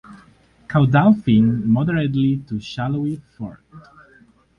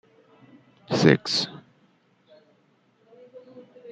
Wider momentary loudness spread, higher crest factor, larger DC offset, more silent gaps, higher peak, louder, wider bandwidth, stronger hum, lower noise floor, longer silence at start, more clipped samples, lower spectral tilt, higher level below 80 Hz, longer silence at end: second, 16 LU vs 28 LU; second, 18 dB vs 26 dB; neither; neither; about the same, -2 dBFS vs -2 dBFS; first, -18 LUFS vs -22 LUFS; second, 7 kHz vs 9.4 kHz; neither; second, -53 dBFS vs -64 dBFS; second, 0.1 s vs 0.9 s; neither; first, -9 dB/octave vs -5 dB/octave; first, -50 dBFS vs -66 dBFS; first, 0.8 s vs 0 s